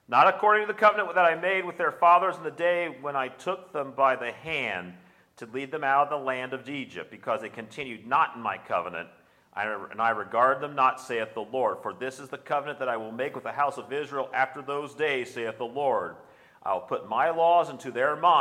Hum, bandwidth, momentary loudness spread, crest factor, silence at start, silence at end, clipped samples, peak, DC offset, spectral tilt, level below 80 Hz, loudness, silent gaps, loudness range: none; 13.5 kHz; 14 LU; 20 dB; 0.1 s; 0 s; under 0.1%; -6 dBFS; under 0.1%; -4.5 dB/octave; -76 dBFS; -27 LUFS; none; 6 LU